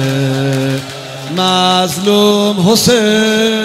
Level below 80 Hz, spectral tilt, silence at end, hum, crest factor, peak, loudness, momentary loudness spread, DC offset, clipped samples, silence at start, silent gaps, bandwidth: -50 dBFS; -4.5 dB/octave; 0 s; none; 12 dB; 0 dBFS; -11 LUFS; 10 LU; under 0.1%; under 0.1%; 0 s; none; 16 kHz